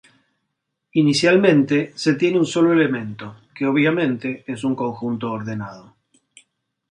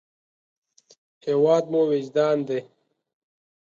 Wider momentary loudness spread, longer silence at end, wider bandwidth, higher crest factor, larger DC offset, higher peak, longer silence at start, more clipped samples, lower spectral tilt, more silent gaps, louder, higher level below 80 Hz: first, 14 LU vs 11 LU; about the same, 1.1 s vs 1.05 s; first, 11 kHz vs 7.4 kHz; about the same, 18 dB vs 18 dB; neither; first, -2 dBFS vs -6 dBFS; second, 0.95 s vs 1.25 s; neither; about the same, -6 dB/octave vs -7 dB/octave; neither; first, -19 LUFS vs -22 LUFS; first, -64 dBFS vs -76 dBFS